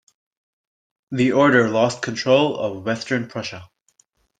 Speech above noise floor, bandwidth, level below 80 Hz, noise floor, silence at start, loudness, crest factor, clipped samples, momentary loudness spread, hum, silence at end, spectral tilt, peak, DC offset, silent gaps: 44 dB; 9.4 kHz; -62 dBFS; -63 dBFS; 1.1 s; -20 LUFS; 20 dB; under 0.1%; 15 LU; none; 0.75 s; -5.5 dB/octave; -2 dBFS; under 0.1%; none